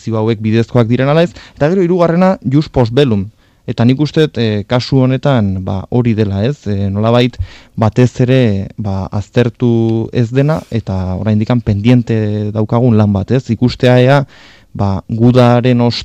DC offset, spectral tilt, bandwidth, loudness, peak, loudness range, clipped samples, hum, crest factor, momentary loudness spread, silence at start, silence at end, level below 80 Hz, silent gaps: under 0.1%; -8 dB/octave; 8.2 kHz; -12 LUFS; 0 dBFS; 2 LU; under 0.1%; none; 12 dB; 8 LU; 0.05 s; 0 s; -40 dBFS; none